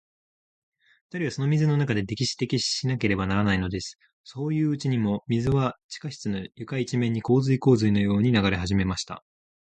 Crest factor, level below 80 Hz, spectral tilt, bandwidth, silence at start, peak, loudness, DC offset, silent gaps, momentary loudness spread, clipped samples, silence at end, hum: 18 dB; -48 dBFS; -6 dB/octave; 9.2 kHz; 1.15 s; -8 dBFS; -25 LUFS; under 0.1%; 4.13-4.24 s, 5.84-5.89 s; 12 LU; under 0.1%; 0.55 s; none